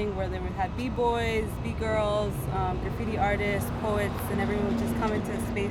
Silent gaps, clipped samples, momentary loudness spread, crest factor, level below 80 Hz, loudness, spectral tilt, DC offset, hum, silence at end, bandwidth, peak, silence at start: none; under 0.1%; 5 LU; 14 dB; -38 dBFS; -29 LUFS; -6.5 dB/octave; under 0.1%; none; 0 s; 18.5 kHz; -14 dBFS; 0 s